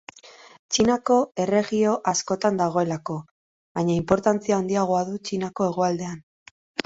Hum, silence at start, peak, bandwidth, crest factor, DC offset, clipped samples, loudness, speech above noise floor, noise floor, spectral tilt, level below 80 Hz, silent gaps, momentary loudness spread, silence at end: none; 0.25 s; -4 dBFS; 8 kHz; 20 dB; under 0.1%; under 0.1%; -23 LUFS; 25 dB; -48 dBFS; -5 dB/octave; -56 dBFS; 0.59-0.69 s, 3.31-3.75 s, 6.23-6.75 s; 12 LU; 0.05 s